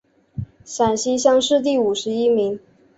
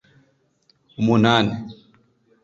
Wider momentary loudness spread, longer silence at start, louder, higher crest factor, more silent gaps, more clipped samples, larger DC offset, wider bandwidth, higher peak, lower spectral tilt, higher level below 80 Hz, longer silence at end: second, 17 LU vs 23 LU; second, 0.35 s vs 1 s; about the same, -19 LUFS vs -19 LUFS; about the same, 18 dB vs 22 dB; neither; neither; neither; about the same, 8.2 kHz vs 7.8 kHz; about the same, -2 dBFS vs -2 dBFS; second, -4 dB/octave vs -6.5 dB/octave; about the same, -52 dBFS vs -56 dBFS; second, 0.4 s vs 0.7 s